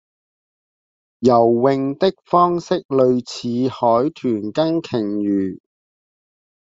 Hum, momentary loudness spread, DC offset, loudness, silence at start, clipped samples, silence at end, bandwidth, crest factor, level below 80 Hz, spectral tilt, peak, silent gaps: none; 7 LU; under 0.1%; -18 LUFS; 1.2 s; under 0.1%; 1.2 s; 7.8 kHz; 18 dB; -60 dBFS; -7 dB/octave; -2 dBFS; 2.85-2.89 s